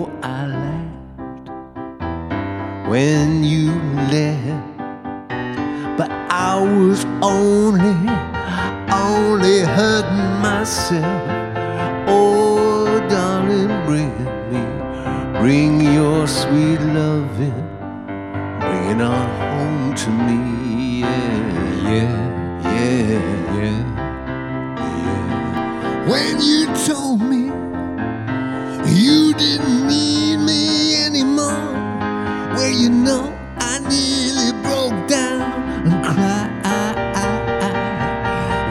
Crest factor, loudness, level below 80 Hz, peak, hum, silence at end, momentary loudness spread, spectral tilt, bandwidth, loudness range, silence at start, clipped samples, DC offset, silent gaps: 16 dB; -18 LUFS; -40 dBFS; 0 dBFS; none; 0 s; 11 LU; -5 dB/octave; 14.5 kHz; 5 LU; 0 s; under 0.1%; under 0.1%; none